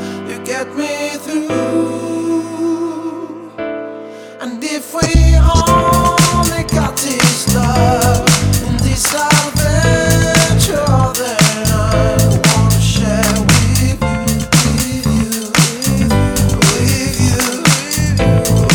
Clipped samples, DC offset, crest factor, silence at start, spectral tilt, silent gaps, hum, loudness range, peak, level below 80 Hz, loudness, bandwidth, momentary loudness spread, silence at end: under 0.1%; under 0.1%; 12 dB; 0 s; -4.5 dB/octave; none; none; 7 LU; 0 dBFS; -22 dBFS; -13 LUFS; over 20 kHz; 11 LU; 0 s